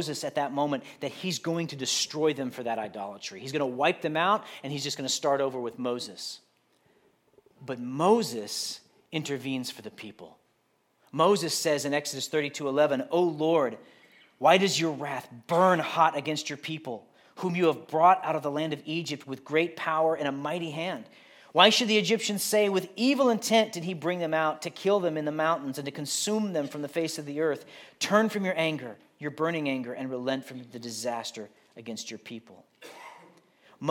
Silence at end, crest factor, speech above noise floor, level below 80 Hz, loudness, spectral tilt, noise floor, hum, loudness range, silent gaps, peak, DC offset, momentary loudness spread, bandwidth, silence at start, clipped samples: 0 s; 26 dB; 43 dB; -82 dBFS; -28 LUFS; -3.5 dB/octave; -71 dBFS; none; 7 LU; none; -4 dBFS; under 0.1%; 16 LU; 17.5 kHz; 0 s; under 0.1%